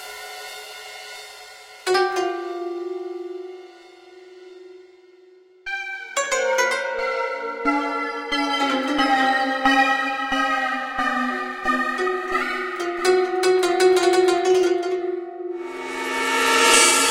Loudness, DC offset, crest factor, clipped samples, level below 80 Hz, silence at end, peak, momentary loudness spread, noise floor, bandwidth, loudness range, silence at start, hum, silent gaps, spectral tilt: -21 LUFS; under 0.1%; 20 dB; under 0.1%; -58 dBFS; 0 s; -2 dBFS; 17 LU; -51 dBFS; 16.5 kHz; 10 LU; 0 s; none; none; -0.5 dB/octave